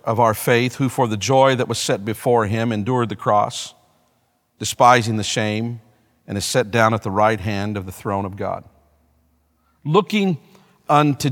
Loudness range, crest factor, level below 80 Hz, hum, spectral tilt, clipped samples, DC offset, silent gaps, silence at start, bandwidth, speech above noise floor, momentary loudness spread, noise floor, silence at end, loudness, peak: 5 LU; 20 dB; -56 dBFS; none; -5 dB/octave; under 0.1%; under 0.1%; none; 0.05 s; 18 kHz; 46 dB; 12 LU; -65 dBFS; 0 s; -19 LUFS; 0 dBFS